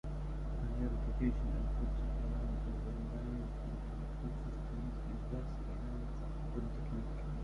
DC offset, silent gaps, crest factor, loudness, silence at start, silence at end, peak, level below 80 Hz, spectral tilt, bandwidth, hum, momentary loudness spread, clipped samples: under 0.1%; none; 16 dB; -42 LUFS; 0.05 s; 0 s; -22 dBFS; -40 dBFS; -9 dB/octave; 6.6 kHz; none; 6 LU; under 0.1%